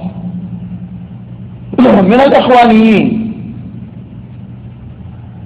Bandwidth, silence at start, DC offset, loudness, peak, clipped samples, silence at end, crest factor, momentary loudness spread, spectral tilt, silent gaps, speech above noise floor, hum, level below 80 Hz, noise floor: 7.8 kHz; 0 s; under 0.1%; -8 LUFS; 0 dBFS; under 0.1%; 0 s; 12 dB; 24 LU; -8 dB/octave; none; 23 dB; none; -40 dBFS; -29 dBFS